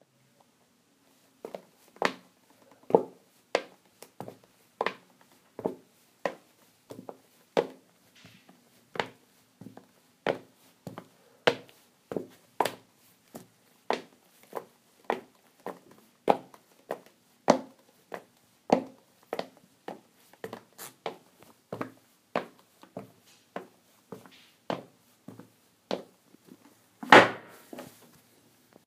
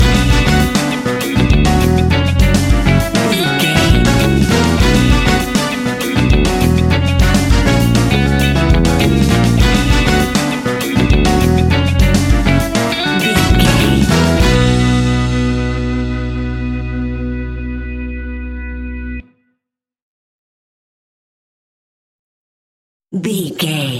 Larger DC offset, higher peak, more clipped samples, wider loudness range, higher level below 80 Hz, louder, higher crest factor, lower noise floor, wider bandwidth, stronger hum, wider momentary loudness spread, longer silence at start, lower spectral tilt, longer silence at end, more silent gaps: neither; about the same, 0 dBFS vs 0 dBFS; neither; first, 17 LU vs 14 LU; second, -76 dBFS vs -20 dBFS; second, -30 LUFS vs -13 LUFS; first, 34 dB vs 12 dB; second, -67 dBFS vs -77 dBFS; about the same, 15.5 kHz vs 17 kHz; neither; first, 23 LU vs 11 LU; first, 1.45 s vs 0 s; second, -4 dB/octave vs -5.5 dB/octave; first, 1 s vs 0 s; second, none vs 20.02-23.00 s